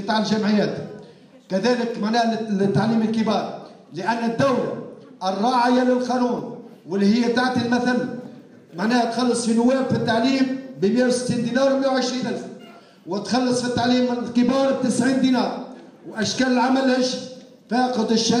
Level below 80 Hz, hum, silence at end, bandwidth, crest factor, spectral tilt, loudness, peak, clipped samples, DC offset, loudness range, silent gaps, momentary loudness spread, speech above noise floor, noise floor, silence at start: -64 dBFS; none; 0 s; 11.5 kHz; 12 dB; -5 dB/octave; -21 LUFS; -8 dBFS; under 0.1%; under 0.1%; 2 LU; none; 14 LU; 26 dB; -46 dBFS; 0 s